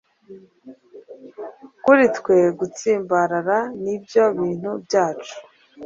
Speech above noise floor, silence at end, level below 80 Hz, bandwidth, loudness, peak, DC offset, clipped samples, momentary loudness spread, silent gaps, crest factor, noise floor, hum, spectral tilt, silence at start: 26 dB; 0 s; -64 dBFS; 7.8 kHz; -19 LUFS; -2 dBFS; under 0.1%; under 0.1%; 21 LU; none; 18 dB; -46 dBFS; none; -5.5 dB/octave; 0.3 s